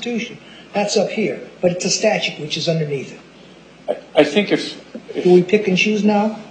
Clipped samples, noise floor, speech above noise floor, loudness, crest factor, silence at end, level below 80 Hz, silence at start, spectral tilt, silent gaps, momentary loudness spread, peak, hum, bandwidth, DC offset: under 0.1%; -43 dBFS; 25 dB; -18 LUFS; 18 dB; 0 s; -62 dBFS; 0 s; -4.5 dB/octave; none; 15 LU; 0 dBFS; none; 9.2 kHz; under 0.1%